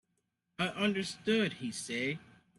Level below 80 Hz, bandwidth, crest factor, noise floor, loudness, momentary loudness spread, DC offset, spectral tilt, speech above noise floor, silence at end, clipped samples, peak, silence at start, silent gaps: -74 dBFS; 12 kHz; 18 dB; -82 dBFS; -34 LUFS; 7 LU; under 0.1%; -4.5 dB/octave; 48 dB; 0.35 s; under 0.1%; -18 dBFS; 0.6 s; none